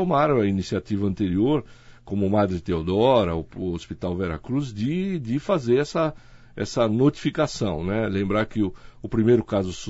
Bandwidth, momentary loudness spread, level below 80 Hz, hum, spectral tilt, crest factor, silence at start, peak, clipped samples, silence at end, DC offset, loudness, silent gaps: 8 kHz; 9 LU; -46 dBFS; none; -7 dB/octave; 18 dB; 0 s; -6 dBFS; under 0.1%; 0 s; under 0.1%; -24 LUFS; none